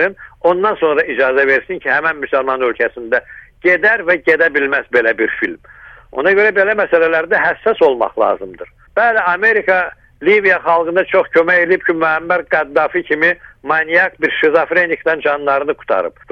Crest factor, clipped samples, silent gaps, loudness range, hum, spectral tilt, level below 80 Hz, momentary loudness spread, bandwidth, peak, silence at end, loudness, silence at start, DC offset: 14 dB; under 0.1%; none; 2 LU; none; -6 dB/octave; -50 dBFS; 7 LU; 6.4 kHz; 0 dBFS; 0.2 s; -14 LUFS; 0 s; under 0.1%